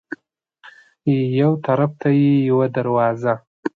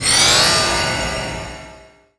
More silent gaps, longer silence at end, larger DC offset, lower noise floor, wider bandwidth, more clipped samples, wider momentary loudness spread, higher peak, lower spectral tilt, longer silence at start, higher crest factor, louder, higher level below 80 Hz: first, 3.47-3.63 s vs none; second, 0.1 s vs 0.4 s; neither; first, -57 dBFS vs -43 dBFS; second, 4.6 kHz vs 11 kHz; neither; second, 10 LU vs 20 LU; second, -4 dBFS vs 0 dBFS; first, -10 dB/octave vs -1 dB/octave; about the same, 0.1 s vs 0 s; about the same, 14 dB vs 18 dB; second, -18 LUFS vs -14 LUFS; second, -64 dBFS vs -36 dBFS